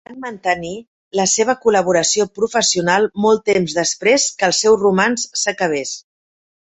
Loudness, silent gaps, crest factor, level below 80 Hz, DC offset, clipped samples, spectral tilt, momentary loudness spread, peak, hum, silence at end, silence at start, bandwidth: -16 LUFS; 0.87-1.11 s; 16 dB; -56 dBFS; under 0.1%; under 0.1%; -2.5 dB/octave; 10 LU; -2 dBFS; none; 0.65 s; 0.1 s; 8.4 kHz